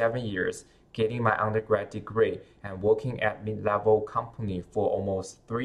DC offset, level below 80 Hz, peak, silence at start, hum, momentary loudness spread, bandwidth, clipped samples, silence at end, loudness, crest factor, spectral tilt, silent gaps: under 0.1%; -56 dBFS; -10 dBFS; 0 s; none; 9 LU; 11.5 kHz; under 0.1%; 0 s; -28 LUFS; 18 dB; -6.5 dB/octave; none